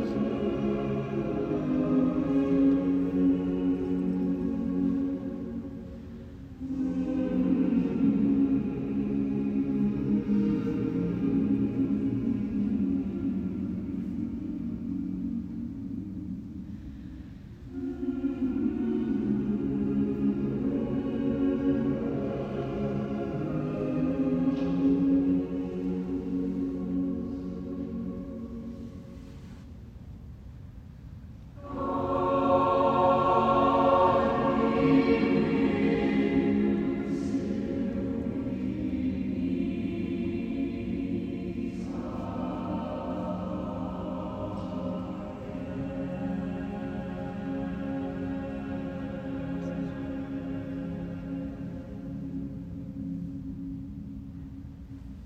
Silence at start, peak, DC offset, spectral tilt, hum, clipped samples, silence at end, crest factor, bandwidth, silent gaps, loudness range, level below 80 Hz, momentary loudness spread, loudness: 0 s; -10 dBFS; under 0.1%; -9 dB/octave; none; under 0.1%; 0 s; 18 dB; 6.8 kHz; none; 12 LU; -48 dBFS; 16 LU; -29 LUFS